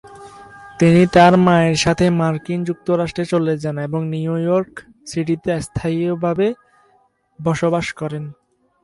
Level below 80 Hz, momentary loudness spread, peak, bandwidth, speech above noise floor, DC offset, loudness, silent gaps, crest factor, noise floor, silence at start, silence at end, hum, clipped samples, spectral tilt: -46 dBFS; 15 LU; 0 dBFS; 11.5 kHz; 42 dB; under 0.1%; -17 LUFS; none; 18 dB; -59 dBFS; 0.05 s; 0.5 s; none; under 0.1%; -6.5 dB/octave